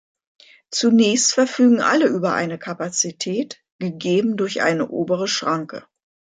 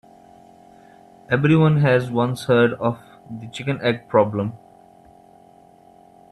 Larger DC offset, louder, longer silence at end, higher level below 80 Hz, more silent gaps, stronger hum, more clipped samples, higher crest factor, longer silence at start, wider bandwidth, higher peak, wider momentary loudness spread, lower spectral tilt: neither; about the same, -19 LUFS vs -19 LUFS; second, 0.55 s vs 1.75 s; second, -68 dBFS vs -58 dBFS; first, 3.72-3.79 s vs none; neither; neither; about the same, 16 dB vs 20 dB; second, 0.7 s vs 1.3 s; second, 9.4 kHz vs 12 kHz; about the same, -4 dBFS vs -2 dBFS; second, 12 LU vs 17 LU; second, -3.5 dB/octave vs -7.5 dB/octave